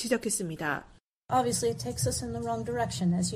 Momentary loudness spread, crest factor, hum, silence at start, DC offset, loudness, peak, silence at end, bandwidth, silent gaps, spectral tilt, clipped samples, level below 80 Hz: 5 LU; 18 dB; none; 0 s; under 0.1%; -30 LUFS; -12 dBFS; 0 s; 15.5 kHz; 1.08-1.21 s; -4.5 dB/octave; under 0.1%; -52 dBFS